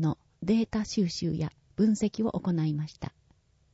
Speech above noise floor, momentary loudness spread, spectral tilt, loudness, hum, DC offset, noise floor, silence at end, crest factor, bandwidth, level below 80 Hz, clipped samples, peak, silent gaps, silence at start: 37 dB; 9 LU; -6.5 dB/octave; -29 LUFS; none; under 0.1%; -65 dBFS; 0.7 s; 14 dB; 8 kHz; -56 dBFS; under 0.1%; -14 dBFS; none; 0 s